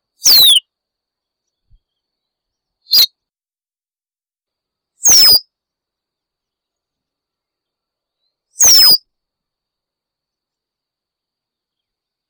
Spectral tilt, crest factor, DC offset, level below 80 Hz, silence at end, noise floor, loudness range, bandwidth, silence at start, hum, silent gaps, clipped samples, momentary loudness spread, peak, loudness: 2.5 dB/octave; 10 dB; under 0.1%; -54 dBFS; 3.3 s; under -90 dBFS; 6 LU; over 20 kHz; 0.25 s; none; none; under 0.1%; 8 LU; -6 dBFS; -7 LUFS